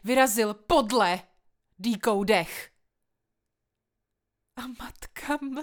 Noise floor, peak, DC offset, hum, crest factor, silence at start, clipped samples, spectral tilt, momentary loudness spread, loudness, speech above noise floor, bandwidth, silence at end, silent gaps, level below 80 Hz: -83 dBFS; -8 dBFS; under 0.1%; none; 20 dB; 0.05 s; under 0.1%; -3.5 dB/octave; 19 LU; -25 LUFS; 57 dB; over 20 kHz; 0 s; none; -52 dBFS